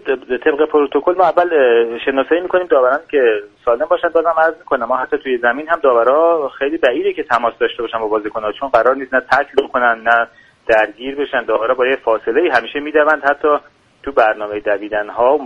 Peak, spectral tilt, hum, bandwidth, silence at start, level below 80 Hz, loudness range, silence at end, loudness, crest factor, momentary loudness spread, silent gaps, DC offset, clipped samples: 0 dBFS; -5 dB/octave; none; 7.6 kHz; 0.05 s; -52 dBFS; 2 LU; 0 s; -15 LUFS; 16 dB; 7 LU; none; under 0.1%; under 0.1%